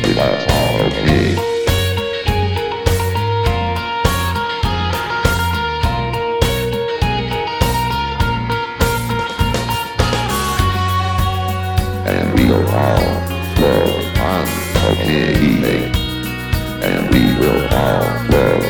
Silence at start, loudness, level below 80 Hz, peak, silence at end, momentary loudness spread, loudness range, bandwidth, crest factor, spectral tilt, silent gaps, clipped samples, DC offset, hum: 0 s; -16 LUFS; -26 dBFS; 0 dBFS; 0 s; 5 LU; 2 LU; 19 kHz; 16 dB; -5.5 dB/octave; none; under 0.1%; under 0.1%; none